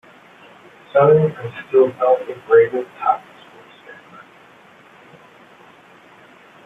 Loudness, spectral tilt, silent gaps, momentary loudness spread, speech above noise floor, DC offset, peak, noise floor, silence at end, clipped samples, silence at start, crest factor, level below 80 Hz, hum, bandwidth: -17 LUFS; -8.5 dB/octave; none; 10 LU; 31 dB; under 0.1%; -2 dBFS; -47 dBFS; 2.75 s; under 0.1%; 0.95 s; 18 dB; -64 dBFS; none; 3.9 kHz